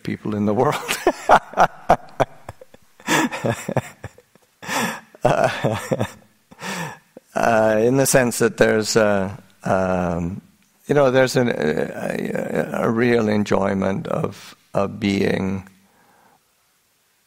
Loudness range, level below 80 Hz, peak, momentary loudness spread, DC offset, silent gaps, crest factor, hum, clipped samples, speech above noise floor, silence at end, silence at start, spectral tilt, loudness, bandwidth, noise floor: 6 LU; -48 dBFS; 0 dBFS; 13 LU; under 0.1%; none; 20 dB; none; under 0.1%; 44 dB; 1.65 s; 0.05 s; -5 dB/octave; -20 LUFS; 16 kHz; -63 dBFS